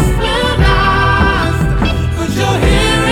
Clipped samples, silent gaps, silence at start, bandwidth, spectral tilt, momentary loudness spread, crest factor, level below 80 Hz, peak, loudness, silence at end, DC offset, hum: under 0.1%; none; 0 s; 16.5 kHz; -5 dB/octave; 4 LU; 10 dB; -18 dBFS; -2 dBFS; -12 LUFS; 0 s; under 0.1%; none